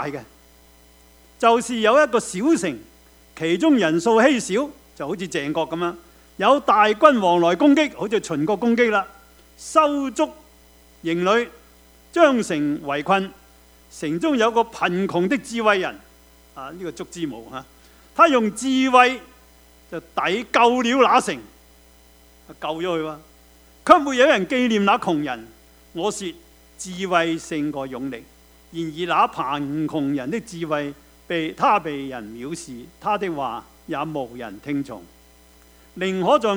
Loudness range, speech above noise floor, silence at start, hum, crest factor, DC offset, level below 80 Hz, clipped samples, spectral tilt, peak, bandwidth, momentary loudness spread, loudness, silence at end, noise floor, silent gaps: 7 LU; 31 dB; 0 s; none; 22 dB; under 0.1%; -56 dBFS; under 0.1%; -4.5 dB/octave; 0 dBFS; over 20 kHz; 17 LU; -20 LUFS; 0 s; -51 dBFS; none